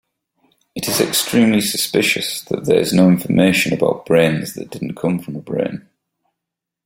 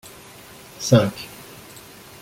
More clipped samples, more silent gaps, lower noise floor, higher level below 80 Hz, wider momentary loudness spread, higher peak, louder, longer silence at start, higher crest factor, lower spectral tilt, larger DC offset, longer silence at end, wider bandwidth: neither; neither; first, -82 dBFS vs -43 dBFS; about the same, -54 dBFS vs -56 dBFS; second, 12 LU vs 24 LU; about the same, 0 dBFS vs -2 dBFS; first, -16 LUFS vs -20 LUFS; about the same, 0.75 s vs 0.8 s; about the same, 18 dB vs 22 dB; about the same, -4.5 dB/octave vs -5.5 dB/octave; neither; first, 1.05 s vs 0.85 s; about the same, 16.5 kHz vs 16.5 kHz